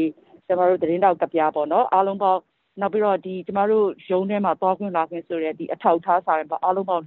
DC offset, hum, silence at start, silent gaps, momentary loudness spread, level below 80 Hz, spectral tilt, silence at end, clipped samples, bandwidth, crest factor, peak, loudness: under 0.1%; none; 0 s; none; 8 LU; -68 dBFS; -5.5 dB/octave; 0 s; under 0.1%; 4.2 kHz; 18 dB; -4 dBFS; -22 LUFS